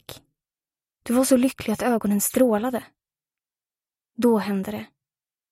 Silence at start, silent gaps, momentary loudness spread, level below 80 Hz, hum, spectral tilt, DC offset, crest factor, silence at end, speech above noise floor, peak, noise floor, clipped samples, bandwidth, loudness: 0.1 s; none; 16 LU; -60 dBFS; none; -5 dB/octave; under 0.1%; 20 dB; 0.65 s; over 68 dB; -6 dBFS; under -90 dBFS; under 0.1%; 16 kHz; -22 LUFS